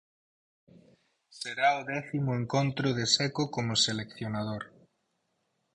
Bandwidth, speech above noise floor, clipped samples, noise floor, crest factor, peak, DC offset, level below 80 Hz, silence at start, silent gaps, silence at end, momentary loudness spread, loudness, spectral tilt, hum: 11 kHz; 48 dB; under 0.1%; -78 dBFS; 24 dB; -8 dBFS; under 0.1%; -64 dBFS; 1.3 s; none; 1.05 s; 12 LU; -29 LUFS; -4 dB/octave; none